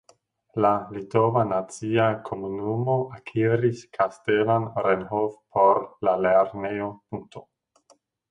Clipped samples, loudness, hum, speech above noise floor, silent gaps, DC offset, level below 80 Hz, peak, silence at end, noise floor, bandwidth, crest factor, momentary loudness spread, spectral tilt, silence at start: under 0.1%; -24 LUFS; none; 38 dB; none; under 0.1%; -60 dBFS; -6 dBFS; 0.9 s; -62 dBFS; 11 kHz; 20 dB; 11 LU; -7.5 dB/octave; 0.55 s